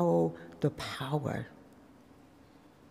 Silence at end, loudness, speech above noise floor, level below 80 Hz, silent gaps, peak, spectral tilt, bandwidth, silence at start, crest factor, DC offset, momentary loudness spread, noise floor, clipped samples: 1.3 s; -34 LUFS; 26 dB; -64 dBFS; none; -16 dBFS; -7 dB/octave; 15 kHz; 0 s; 18 dB; under 0.1%; 14 LU; -58 dBFS; under 0.1%